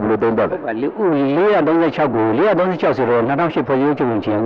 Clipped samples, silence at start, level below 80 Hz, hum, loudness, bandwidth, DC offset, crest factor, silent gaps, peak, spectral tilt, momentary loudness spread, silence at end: under 0.1%; 0 s; -52 dBFS; none; -16 LUFS; 6.2 kHz; under 0.1%; 10 dB; none; -6 dBFS; -9 dB/octave; 4 LU; 0 s